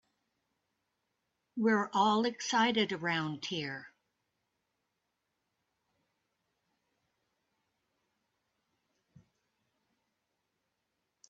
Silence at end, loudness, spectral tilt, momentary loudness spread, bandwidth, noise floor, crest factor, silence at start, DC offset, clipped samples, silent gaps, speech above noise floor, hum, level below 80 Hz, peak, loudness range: 7.4 s; -31 LUFS; -4 dB/octave; 11 LU; 8 kHz; -84 dBFS; 22 dB; 1.55 s; under 0.1%; under 0.1%; none; 53 dB; none; -82 dBFS; -16 dBFS; 13 LU